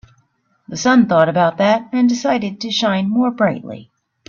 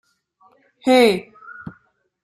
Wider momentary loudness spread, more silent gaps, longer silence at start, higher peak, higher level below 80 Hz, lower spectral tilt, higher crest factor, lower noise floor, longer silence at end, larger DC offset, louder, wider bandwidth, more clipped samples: second, 13 LU vs 25 LU; neither; second, 0.7 s vs 0.85 s; about the same, 0 dBFS vs -2 dBFS; about the same, -58 dBFS vs -62 dBFS; about the same, -5 dB/octave vs -4.5 dB/octave; about the same, 16 dB vs 20 dB; about the same, -61 dBFS vs -60 dBFS; about the same, 0.45 s vs 0.55 s; neither; about the same, -16 LUFS vs -17 LUFS; second, 7.2 kHz vs 16 kHz; neither